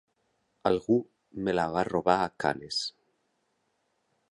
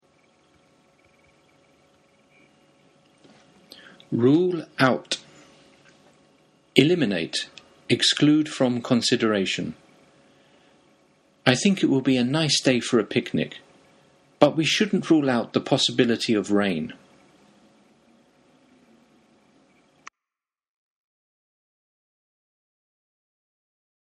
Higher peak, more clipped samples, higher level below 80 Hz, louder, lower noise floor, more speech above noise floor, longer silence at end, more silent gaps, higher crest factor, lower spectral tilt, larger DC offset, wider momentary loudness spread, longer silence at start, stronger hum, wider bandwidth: second, -8 dBFS vs 0 dBFS; neither; first, -60 dBFS vs -66 dBFS; second, -29 LUFS vs -22 LUFS; second, -76 dBFS vs under -90 dBFS; second, 48 dB vs over 69 dB; second, 1.4 s vs 7.15 s; neither; about the same, 22 dB vs 26 dB; about the same, -5 dB/octave vs -4.5 dB/octave; neither; about the same, 8 LU vs 10 LU; second, 0.65 s vs 4.1 s; neither; about the same, 11.5 kHz vs 12 kHz